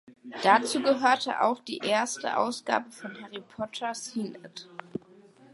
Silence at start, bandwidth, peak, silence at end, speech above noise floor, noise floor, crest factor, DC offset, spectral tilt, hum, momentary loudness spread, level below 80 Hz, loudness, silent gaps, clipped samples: 0.1 s; 11.5 kHz; -6 dBFS; 0.55 s; 27 dB; -55 dBFS; 22 dB; under 0.1%; -3 dB/octave; none; 19 LU; -76 dBFS; -27 LUFS; none; under 0.1%